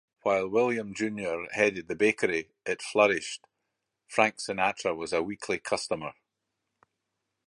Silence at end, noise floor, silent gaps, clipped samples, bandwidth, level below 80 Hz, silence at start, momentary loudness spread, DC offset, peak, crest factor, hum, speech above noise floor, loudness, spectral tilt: 1.35 s; -83 dBFS; none; under 0.1%; 11.5 kHz; -66 dBFS; 0.25 s; 9 LU; under 0.1%; -6 dBFS; 24 dB; none; 55 dB; -28 LUFS; -4 dB/octave